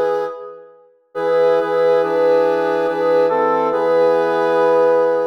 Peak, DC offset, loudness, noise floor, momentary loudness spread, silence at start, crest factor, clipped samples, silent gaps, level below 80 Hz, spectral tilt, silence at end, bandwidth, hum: -4 dBFS; under 0.1%; -16 LUFS; -48 dBFS; 9 LU; 0 s; 12 dB; under 0.1%; none; -66 dBFS; -6 dB/octave; 0 s; 6.2 kHz; none